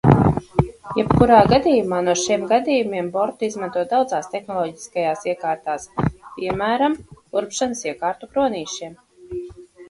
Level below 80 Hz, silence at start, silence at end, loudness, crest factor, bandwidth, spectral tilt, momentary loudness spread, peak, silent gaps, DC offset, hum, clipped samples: -40 dBFS; 0.05 s; 0.05 s; -20 LUFS; 20 dB; 11.5 kHz; -6 dB/octave; 14 LU; 0 dBFS; none; under 0.1%; none; under 0.1%